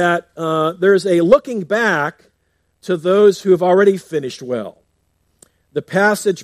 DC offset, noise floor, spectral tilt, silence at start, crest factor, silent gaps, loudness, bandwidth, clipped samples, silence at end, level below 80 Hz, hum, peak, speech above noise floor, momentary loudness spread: under 0.1%; -65 dBFS; -5.5 dB/octave; 0 s; 16 dB; none; -16 LUFS; 14.5 kHz; under 0.1%; 0 s; -58 dBFS; none; 0 dBFS; 50 dB; 12 LU